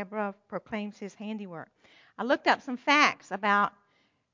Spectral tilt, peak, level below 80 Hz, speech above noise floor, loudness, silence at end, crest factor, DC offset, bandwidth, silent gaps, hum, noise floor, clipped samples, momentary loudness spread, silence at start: -3.5 dB/octave; -6 dBFS; -76 dBFS; 41 dB; -28 LUFS; 0.65 s; 24 dB; under 0.1%; 7.6 kHz; none; none; -70 dBFS; under 0.1%; 18 LU; 0 s